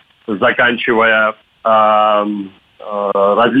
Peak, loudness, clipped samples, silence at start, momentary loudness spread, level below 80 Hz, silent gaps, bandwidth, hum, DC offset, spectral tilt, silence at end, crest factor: -2 dBFS; -13 LUFS; under 0.1%; 0.3 s; 13 LU; -58 dBFS; none; 4.7 kHz; none; under 0.1%; -7 dB/octave; 0 s; 12 dB